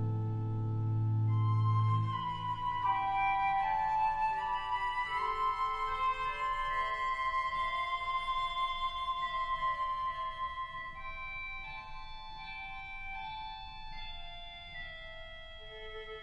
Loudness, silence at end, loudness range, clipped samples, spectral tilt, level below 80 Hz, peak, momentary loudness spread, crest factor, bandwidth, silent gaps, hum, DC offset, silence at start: -34 LUFS; 0 s; 12 LU; under 0.1%; -6 dB/octave; -50 dBFS; -22 dBFS; 15 LU; 14 dB; 7.8 kHz; none; none; under 0.1%; 0 s